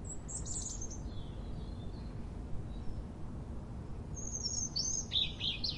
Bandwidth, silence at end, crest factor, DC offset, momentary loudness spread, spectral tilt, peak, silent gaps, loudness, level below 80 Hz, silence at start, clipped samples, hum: 11.5 kHz; 0 s; 18 dB; under 0.1%; 13 LU; -2.5 dB/octave; -20 dBFS; none; -39 LUFS; -46 dBFS; 0 s; under 0.1%; none